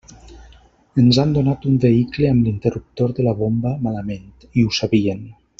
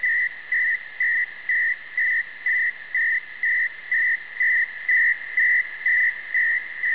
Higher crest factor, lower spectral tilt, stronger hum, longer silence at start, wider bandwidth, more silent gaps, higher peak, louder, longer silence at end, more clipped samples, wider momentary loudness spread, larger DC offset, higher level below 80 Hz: first, 16 dB vs 10 dB; first, -7.5 dB/octave vs -1.5 dB/octave; neither; first, 0.25 s vs 0 s; first, 7.6 kHz vs 4 kHz; neither; first, -4 dBFS vs -12 dBFS; about the same, -18 LUFS vs -20 LUFS; first, 0.3 s vs 0 s; neither; first, 9 LU vs 5 LU; second, under 0.1% vs 0.5%; first, -44 dBFS vs -74 dBFS